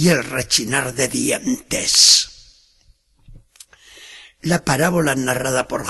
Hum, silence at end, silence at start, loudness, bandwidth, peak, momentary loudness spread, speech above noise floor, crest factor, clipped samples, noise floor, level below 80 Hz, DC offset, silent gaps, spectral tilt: none; 0 s; 0 s; -16 LUFS; 13 kHz; 0 dBFS; 12 LU; 38 dB; 20 dB; under 0.1%; -56 dBFS; -48 dBFS; under 0.1%; none; -2.5 dB/octave